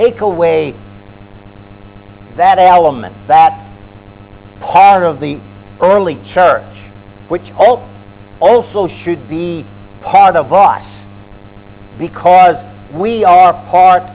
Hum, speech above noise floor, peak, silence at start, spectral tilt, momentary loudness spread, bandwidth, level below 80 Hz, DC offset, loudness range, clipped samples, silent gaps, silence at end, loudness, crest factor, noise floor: none; 26 dB; 0 dBFS; 0 s; -9.5 dB/octave; 16 LU; 4 kHz; -44 dBFS; under 0.1%; 3 LU; under 0.1%; none; 0 s; -10 LUFS; 12 dB; -35 dBFS